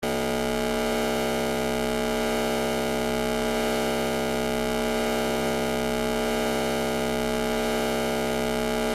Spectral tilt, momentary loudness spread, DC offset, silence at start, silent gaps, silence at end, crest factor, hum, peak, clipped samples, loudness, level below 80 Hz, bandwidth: -4 dB/octave; 1 LU; under 0.1%; 0 s; none; 0 s; 14 dB; none; -12 dBFS; under 0.1%; -26 LUFS; -40 dBFS; 16 kHz